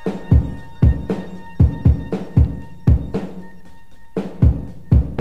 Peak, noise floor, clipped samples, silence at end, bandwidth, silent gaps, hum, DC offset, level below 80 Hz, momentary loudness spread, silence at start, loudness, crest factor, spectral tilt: -2 dBFS; -45 dBFS; under 0.1%; 0 s; 4.9 kHz; none; none; 2%; -22 dBFS; 11 LU; 0.05 s; -19 LUFS; 16 dB; -10 dB/octave